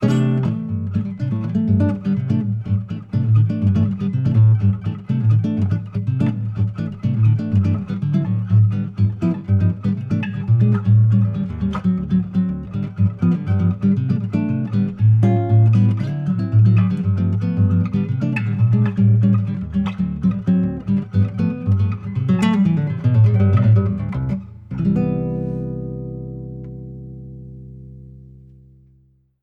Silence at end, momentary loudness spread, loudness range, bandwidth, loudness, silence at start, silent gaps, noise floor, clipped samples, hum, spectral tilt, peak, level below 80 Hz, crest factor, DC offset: 1.2 s; 10 LU; 6 LU; 4.7 kHz; -19 LUFS; 0 s; none; -56 dBFS; under 0.1%; none; -10 dB/octave; -4 dBFS; -44 dBFS; 14 dB; under 0.1%